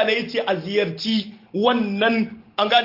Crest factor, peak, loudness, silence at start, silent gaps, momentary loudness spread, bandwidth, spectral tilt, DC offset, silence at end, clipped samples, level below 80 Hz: 18 dB; -2 dBFS; -22 LUFS; 0 s; none; 5 LU; 5.8 kHz; -5.5 dB/octave; under 0.1%; 0 s; under 0.1%; -66 dBFS